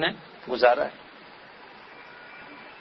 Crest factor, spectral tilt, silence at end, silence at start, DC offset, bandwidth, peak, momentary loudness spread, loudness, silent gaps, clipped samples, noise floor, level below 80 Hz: 24 dB; -6.5 dB/octave; 0.05 s; 0 s; under 0.1%; 6 kHz; -6 dBFS; 25 LU; -24 LUFS; none; under 0.1%; -48 dBFS; -66 dBFS